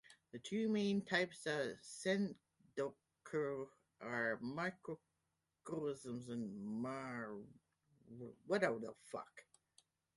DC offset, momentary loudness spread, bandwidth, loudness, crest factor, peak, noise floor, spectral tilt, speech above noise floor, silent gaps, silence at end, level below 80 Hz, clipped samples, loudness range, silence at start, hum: under 0.1%; 17 LU; 11.5 kHz; -43 LUFS; 22 dB; -22 dBFS; -88 dBFS; -5 dB/octave; 45 dB; none; 0.75 s; -82 dBFS; under 0.1%; 6 LU; 0.1 s; none